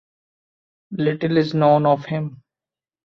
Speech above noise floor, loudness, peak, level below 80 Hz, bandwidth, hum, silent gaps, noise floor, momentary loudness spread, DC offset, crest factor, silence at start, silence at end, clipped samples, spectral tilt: over 72 dB; -19 LUFS; -4 dBFS; -64 dBFS; 6.4 kHz; none; none; under -90 dBFS; 13 LU; under 0.1%; 18 dB; 0.9 s; 0.7 s; under 0.1%; -9 dB/octave